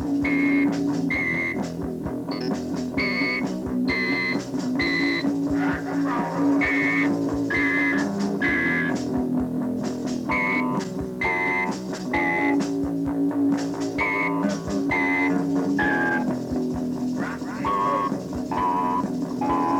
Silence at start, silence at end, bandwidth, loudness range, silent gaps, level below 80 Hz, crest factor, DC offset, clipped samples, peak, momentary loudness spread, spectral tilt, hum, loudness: 0 s; 0 s; 14.5 kHz; 3 LU; none; -48 dBFS; 14 dB; under 0.1%; under 0.1%; -10 dBFS; 7 LU; -6 dB/octave; none; -24 LUFS